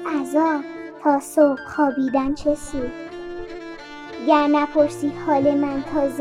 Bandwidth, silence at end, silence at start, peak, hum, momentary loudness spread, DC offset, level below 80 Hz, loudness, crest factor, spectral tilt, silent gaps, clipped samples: 14.5 kHz; 0 s; 0 s; -2 dBFS; none; 16 LU; under 0.1%; -48 dBFS; -21 LUFS; 18 dB; -5.5 dB/octave; none; under 0.1%